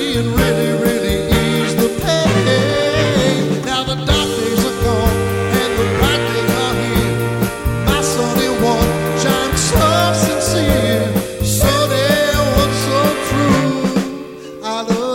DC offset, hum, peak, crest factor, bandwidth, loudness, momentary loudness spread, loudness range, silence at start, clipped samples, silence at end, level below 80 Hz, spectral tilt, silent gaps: under 0.1%; none; -2 dBFS; 14 dB; 17 kHz; -15 LUFS; 5 LU; 2 LU; 0 s; under 0.1%; 0 s; -28 dBFS; -4.5 dB/octave; none